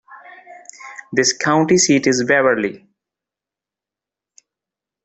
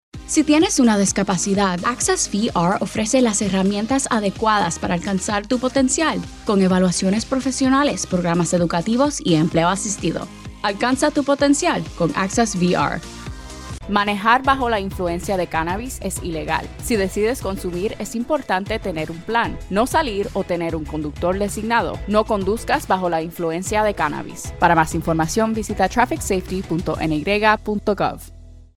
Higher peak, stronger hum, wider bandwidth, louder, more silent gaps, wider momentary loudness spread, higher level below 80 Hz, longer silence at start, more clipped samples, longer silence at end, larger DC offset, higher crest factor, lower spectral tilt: about the same, -2 dBFS vs -2 dBFS; neither; second, 8.4 kHz vs 16 kHz; first, -15 LUFS vs -20 LUFS; neither; first, 21 LU vs 8 LU; second, -60 dBFS vs -38 dBFS; about the same, 0.1 s vs 0.15 s; neither; first, 2.25 s vs 0.15 s; neither; about the same, 18 dB vs 18 dB; about the same, -3.5 dB/octave vs -4.5 dB/octave